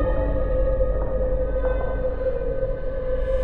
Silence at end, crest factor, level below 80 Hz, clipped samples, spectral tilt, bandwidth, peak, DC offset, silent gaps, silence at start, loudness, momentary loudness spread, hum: 0 s; 12 dB; -26 dBFS; under 0.1%; -10.5 dB/octave; 3.9 kHz; -10 dBFS; under 0.1%; none; 0 s; -26 LUFS; 4 LU; none